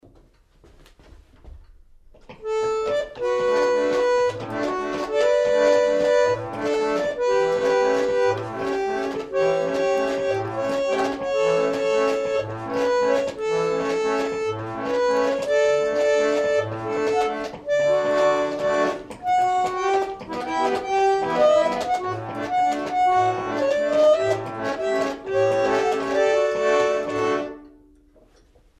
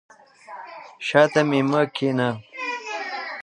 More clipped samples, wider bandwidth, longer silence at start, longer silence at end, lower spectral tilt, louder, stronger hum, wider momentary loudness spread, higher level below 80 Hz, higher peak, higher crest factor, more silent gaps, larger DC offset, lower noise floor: neither; about the same, 12 kHz vs 11 kHz; first, 1.45 s vs 0.5 s; first, 1.1 s vs 0.05 s; second, -4.5 dB/octave vs -6 dB/octave; about the same, -22 LUFS vs -22 LUFS; neither; second, 7 LU vs 21 LU; first, -54 dBFS vs -70 dBFS; second, -8 dBFS vs -2 dBFS; second, 14 dB vs 22 dB; neither; neither; first, -55 dBFS vs -43 dBFS